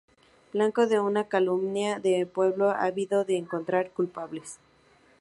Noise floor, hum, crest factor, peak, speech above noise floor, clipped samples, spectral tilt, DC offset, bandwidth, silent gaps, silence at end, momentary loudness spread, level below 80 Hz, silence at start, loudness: -61 dBFS; none; 16 dB; -10 dBFS; 34 dB; under 0.1%; -5.5 dB/octave; under 0.1%; 11.5 kHz; none; 0.65 s; 10 LU; -74 dBFS; 0.55 s; -27 LUFS